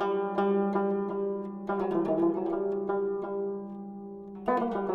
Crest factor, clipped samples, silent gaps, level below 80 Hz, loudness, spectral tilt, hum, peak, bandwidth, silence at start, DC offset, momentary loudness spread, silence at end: 16 dB; under 0.1%; none; -64 dBFS; -30 LUFS; -9.5 dB/octave; none; -14 dBFS; 5.2 kHz; 0 s; under 0.1%; 12 LU; 0 s